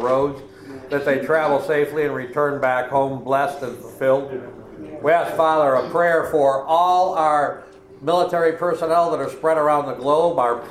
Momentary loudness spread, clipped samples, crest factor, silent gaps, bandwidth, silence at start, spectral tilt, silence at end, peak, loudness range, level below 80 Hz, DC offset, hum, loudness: 13 LU; under 0.1%; 14 dB; none; 15 kHz; 0 s; -6 dB/octave; 0 s; -4 dBFS; 3 LU; -56 dBFS; under 0.1%; none; -19 LUFS